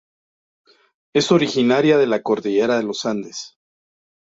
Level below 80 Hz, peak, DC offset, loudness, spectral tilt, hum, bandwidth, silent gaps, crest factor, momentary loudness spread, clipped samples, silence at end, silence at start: -64 dBFS; -4 dBFS; under 0.1%; -18 LUFS; -5 dB/octave; none; 7.8 kHz; none; 16 dB; 14 LU; under 0.1%; 0.85 s; 1.15 s